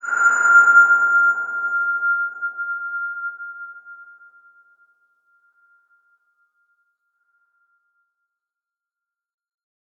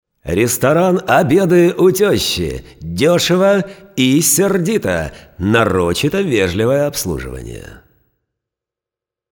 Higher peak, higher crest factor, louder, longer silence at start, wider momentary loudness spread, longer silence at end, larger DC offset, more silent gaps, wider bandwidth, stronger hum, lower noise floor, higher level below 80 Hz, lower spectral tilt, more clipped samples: second, -4 dBFS vs 0 dBFS; about the same, 18 dB vs 14 dB; about the same, -16 LUFS vs -14 LUFS; second, 0.05 s vs 0.25 s; first, 22 LU vs 13 LU; first, 5.95 s vs 1.55 s; neither; neither; second, 7.6 kHz vs over 20 kHz; neither; about the same, -87 dBFS vs -86 dBFS; second, under -90 dBFS vs -38 dBFS; second, -0.5 dB/octave vs -4.5 dB/octave; neither